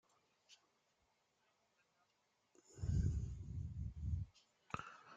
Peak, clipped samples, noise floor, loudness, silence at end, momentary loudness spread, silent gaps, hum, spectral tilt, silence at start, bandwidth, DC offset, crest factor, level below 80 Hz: -24 dBFS; under 0.1%; -82 dBFS; -46 LUFS; 0 s; 11 LU; none; none; -7 dB/octave; 0.5 s; 7.8 kHz; under 0.1%; 22 dB; -52 dBFS